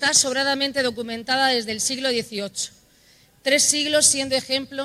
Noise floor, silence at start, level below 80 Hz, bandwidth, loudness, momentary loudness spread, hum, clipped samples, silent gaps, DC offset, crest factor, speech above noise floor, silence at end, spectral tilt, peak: -55 dBFS; 0 s; -62 dBFS; 16 kHz; -20 LUFS; 12 LU; none; under 0.1%; none; under 0.1%; 20 dB; 33 dB; 0 s; -0.5 dB/octave; -2 dBFS